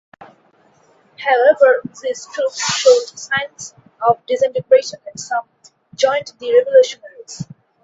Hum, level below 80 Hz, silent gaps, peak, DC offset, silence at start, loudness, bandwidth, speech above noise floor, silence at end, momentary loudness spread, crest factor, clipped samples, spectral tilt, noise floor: none; -64 dBFS; none; 0 dBFS; under 0.1%; 0.2 s; -16 LUFS; 8 kHz; 38 dB; 0.4 s; 19 LU; 18 dB; under 0.1%; -2 dB/octave; -54 dBFS